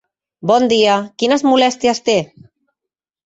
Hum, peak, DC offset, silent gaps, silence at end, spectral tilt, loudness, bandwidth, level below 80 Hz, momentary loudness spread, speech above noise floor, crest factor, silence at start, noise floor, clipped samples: none; -2 dBFS; under 0.1%; none; 1 s; -4 dB/octave; -15 LUFS; 8.2 kHz; -60 dBFS; 6 LU; 71 dB; 14 dB; 0.45 s; -85 dBFS; under 0.1%